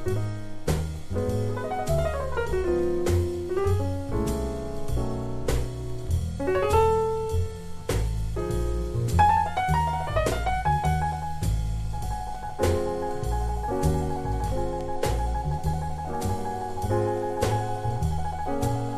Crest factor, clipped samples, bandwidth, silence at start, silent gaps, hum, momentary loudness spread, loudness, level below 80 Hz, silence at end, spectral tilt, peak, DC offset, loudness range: 18 dB; under 0.1%; 13.5 kHz; 0 s; none; none; 7 LU; -27 LUFS; -32 dBFS; 0 s; -6.5 dB/octave; -8 dBFS; under 0.1%; 4 LU